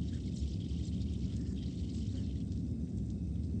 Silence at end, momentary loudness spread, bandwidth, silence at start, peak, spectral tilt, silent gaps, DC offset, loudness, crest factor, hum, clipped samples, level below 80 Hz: 0 s; 1 LU; 8.8 kHz; 0 s; -26 dBFS; -8 dB/octave; none; under 0.1%; -38 LUFS; 12 dB; none; under 0.1%; -42 dBFS